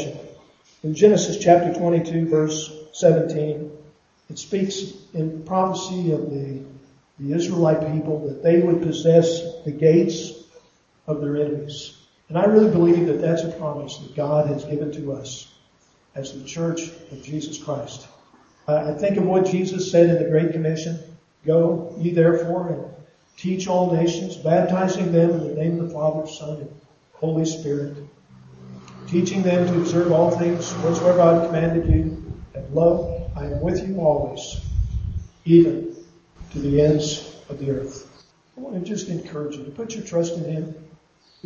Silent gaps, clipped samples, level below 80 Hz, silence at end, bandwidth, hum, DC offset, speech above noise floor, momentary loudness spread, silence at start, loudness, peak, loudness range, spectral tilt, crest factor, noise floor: none; under 0.1%; -40 dBFS; 0.6 s; 7.6 kHz; none; under 0.1%; 39 dB; 18 LU; 0 s; -21 LUFS; 0 dBFS; 8 LU; -6.5 dB/octave; 20 dB; -59 dBFS